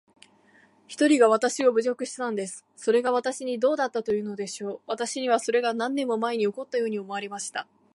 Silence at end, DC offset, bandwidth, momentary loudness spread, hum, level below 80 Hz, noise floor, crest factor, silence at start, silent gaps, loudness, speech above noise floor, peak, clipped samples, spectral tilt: 0.3 s; under 0.1%; 11.5 kHz; 12 LU; none; -76 dBFS; -59 dBFS; 20 dB; 0.9 s; none; -26 LUFS; 34 dB; -6 dBFS; under 0.1%; -3.5 dB/octave